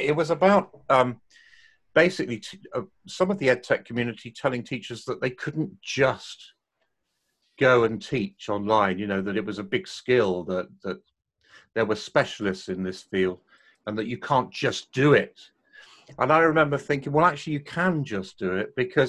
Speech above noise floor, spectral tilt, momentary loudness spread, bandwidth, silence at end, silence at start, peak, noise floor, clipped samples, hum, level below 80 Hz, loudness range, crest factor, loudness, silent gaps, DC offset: 52 dB; -6 dB/octave; 14 LU; 11.5 kHz; 0 s; 0 s; -4 dBFS; -77 dBFS; under 0.1%; none; -60 dBFS; 5 LU; 20 dB; -25 LUFS; none; under 0.1%